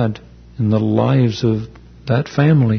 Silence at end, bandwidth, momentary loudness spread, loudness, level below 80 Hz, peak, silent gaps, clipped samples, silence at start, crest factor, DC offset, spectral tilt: 0 s; 6.4 kHz; 17 LU; -17 LUFS; -44 dBFS; -2 dBFS; none; under 0.1%; 0 s; 14 dB; under 0.1%; -8.5 dB/octave